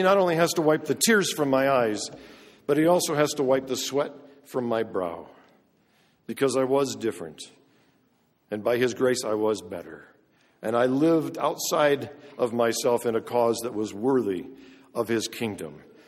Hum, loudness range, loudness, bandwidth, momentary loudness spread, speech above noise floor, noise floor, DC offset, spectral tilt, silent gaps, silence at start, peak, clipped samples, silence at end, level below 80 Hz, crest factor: none; 6 LU; -25 LUFS; 16 kHz; 16 LU; 42 dB; -67 dBFS; under 0.1%; -4 dB/octave; none; 0 s; -8 dBFS; under 0.1%; 0.3 s; -68 dBFS; 18 dB